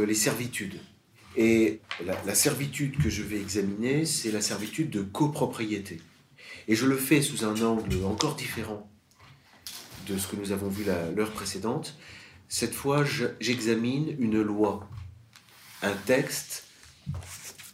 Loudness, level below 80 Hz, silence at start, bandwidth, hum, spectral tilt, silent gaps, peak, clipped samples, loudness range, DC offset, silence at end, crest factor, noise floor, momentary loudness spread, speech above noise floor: -28 LUFS; -54 dBFS; 0 s; 16 kHz; none; -4.5 dB/octave; none; -6 dBFS; under 0.1%; 6 LU; under 0.1%; 0.05 s; 24 dB; -56 dBFS; 17 LU; 28 dB